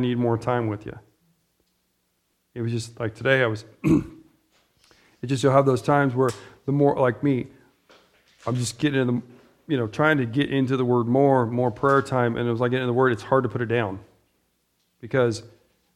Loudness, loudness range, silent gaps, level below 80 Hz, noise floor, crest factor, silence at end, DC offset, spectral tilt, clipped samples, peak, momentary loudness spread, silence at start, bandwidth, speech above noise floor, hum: -23 LUFS; 5 LU; none; -56 dBFS; -72 dBFS; 20 dB; 0.5 s; under 0.1%; -6.5 dB/octave; under 0.1%; -4 dBFS; 12 LU; 0 s; 13 kHz; 49 dB; none